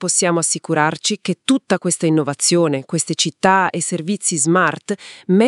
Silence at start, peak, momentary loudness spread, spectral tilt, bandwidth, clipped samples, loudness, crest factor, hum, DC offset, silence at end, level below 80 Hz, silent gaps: 0 s; 0 dBFS; 6 LU; -3.5 dB/octave; 12 kHz; under 0.1%; -17 LUFS; 18 dB; none; under 0.1%; 0 s; -66 dBFS; none